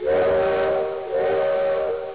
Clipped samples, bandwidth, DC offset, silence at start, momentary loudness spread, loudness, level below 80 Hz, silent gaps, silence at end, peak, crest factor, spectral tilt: under 0.1%; 4 kHz; 0.3%; 0 s; 5 LU; -22 LUFS; -50 dBFS; none; 0 s; -14 dBFS; 8 dB; -9 dB/octave